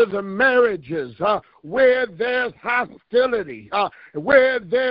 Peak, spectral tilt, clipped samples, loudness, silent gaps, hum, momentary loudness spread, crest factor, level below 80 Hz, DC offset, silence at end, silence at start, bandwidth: -2 dBFS; -9 dB/octave; under 0.1%; -20 LUFS; none; none; 10 LU; 18 dB; -56 dBFS; under 0.1%; 0 s; 0 s; 5.2 kHz